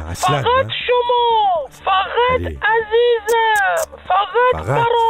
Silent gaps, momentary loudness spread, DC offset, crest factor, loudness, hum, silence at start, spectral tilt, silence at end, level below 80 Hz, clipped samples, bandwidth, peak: none; 4 LU; under 0.1%; 10 dB; -16 LUFS; none; 0 s; -3.5 dB/octave; 0 s; -40 dBFS; under 0.1%; 16.5 kHz; -6 dBFS